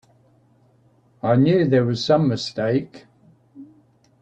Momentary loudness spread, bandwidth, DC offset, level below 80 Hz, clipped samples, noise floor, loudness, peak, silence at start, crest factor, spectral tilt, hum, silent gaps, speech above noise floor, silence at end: 9 LU; 8.6 kHz; under 0.1%; -62 dBFS; under 0.1%; -58 dBFS; -20 LUFS; -6 dBFS; 1.25 s; 16 dB; -7 dB/octave; none; none; 39 dB; 0.6 s